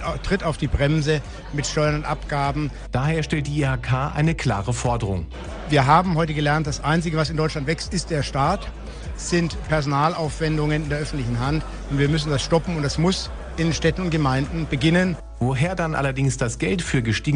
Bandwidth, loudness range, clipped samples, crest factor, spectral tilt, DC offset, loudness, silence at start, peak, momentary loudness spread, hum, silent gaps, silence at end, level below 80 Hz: 10 kHz; 2 LU; under 0.1%; 18 dB; -5.5 dB/octave; under 0.1%; -22 LUFS; 0 s; -4 dBFS; 6 LU; none; none; 0 s; -34 dBFS